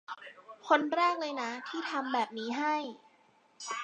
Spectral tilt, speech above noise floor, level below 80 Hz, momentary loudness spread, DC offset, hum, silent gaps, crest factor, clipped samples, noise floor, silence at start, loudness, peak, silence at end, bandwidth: -2.5 dB/octave; 34 dB; under -90 dBFS; 17 LU; under 0.1%; none; none; 22 dB; under 0.1%; -66 dBFS; 0.1 s; -32 LUFS; -12 dBFS; 0 s; 9.6 kHz